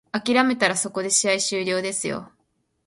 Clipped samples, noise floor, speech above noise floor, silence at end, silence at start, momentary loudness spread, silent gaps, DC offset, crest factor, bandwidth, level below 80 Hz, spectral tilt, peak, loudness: under 0.1%; -71 dBFS; 48 dB; 0.6 s; 0.15 s; 8 LU; none; under 0.1%; 20 dB; 11.5 kHz; -66 dBFS; -2 dB/octave; -4 dBFS; -21 LUFS